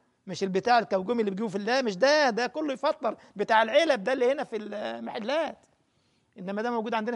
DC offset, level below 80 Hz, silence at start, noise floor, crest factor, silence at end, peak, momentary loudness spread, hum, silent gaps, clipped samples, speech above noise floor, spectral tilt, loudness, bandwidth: under 0.1%; -74 dBFS; 0.25 s; -70 dBFS; 18 dB; 0 s; -8 dBFS; 12 LU; none; none; under 0.1%; 43 dB; -4.5 dB/octave; -27 LUFS; 10.5 kHz